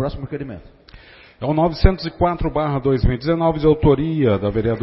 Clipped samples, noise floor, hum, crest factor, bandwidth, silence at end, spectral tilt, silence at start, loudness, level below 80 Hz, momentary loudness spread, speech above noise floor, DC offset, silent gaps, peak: under 0.1%; -44 dBFS; none; 18 dB; 5.8 kHz; 0 s; -11.5 dB/octave; 0 s; -19 LUFS; -26 dBFS; 13 LU; 26 dB; under 0.1%; none; 0 dBFS